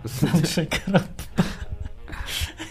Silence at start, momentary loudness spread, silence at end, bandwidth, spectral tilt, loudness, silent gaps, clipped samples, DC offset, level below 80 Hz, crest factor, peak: 0 s; 15 LU; 0 s; 15.5 kHz; -5 dB/octave; -25 LUFS; none; under 0.1%; under 0.1%; -38 dBFS; 20 dB; -4 dBFS